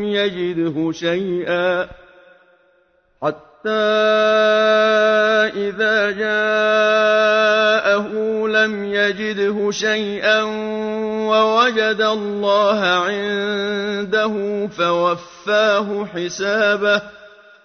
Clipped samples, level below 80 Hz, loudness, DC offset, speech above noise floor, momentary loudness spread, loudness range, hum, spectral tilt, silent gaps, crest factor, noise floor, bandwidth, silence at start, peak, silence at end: under 0.1%; -58 dBFS; -17 LUFS; under 0.1%; 42 dB; 9 LU; 4 LU; none; -4 dB/octave; none; 14 dB; -59 dBFS; 6.6 kHz; 0 s; -4 dBFS; 0.35 s